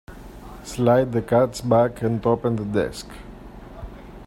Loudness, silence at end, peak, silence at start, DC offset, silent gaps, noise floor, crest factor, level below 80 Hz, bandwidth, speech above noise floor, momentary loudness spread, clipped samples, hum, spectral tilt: -21 LUFS; 0 s; -4 dBFS; 0.1 s; under 0.1%; none; -40 dBFS; 18 dB; -44 dBFS; 16 kHz; 19 dB; 22 LU; under 0.1%; none; -7 dB/octave